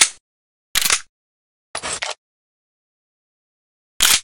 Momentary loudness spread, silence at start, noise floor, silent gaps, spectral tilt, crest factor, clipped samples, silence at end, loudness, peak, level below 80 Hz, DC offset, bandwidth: 14 LU; 0 s; under -90 dBFS; 0.20-0.75 s, 1.09-1.74 s, 2.18-4.00 s; 2 dB/octave; 24 dB; under 0.1%; 0 s; -19 LUFS; 0 dBFS; -50 dBFS; under 0.1%; 17 kHz